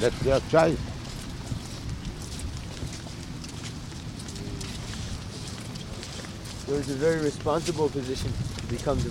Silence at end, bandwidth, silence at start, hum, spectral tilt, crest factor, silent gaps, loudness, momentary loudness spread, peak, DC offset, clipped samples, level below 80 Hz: 0 s; 16 kHz; 0 s; none; -5.5 dB/octave; 22 dB; none; -30 LUFS; 13 LU; -6 dBFS; under 0.1%; under 0.1%; -42 dBFS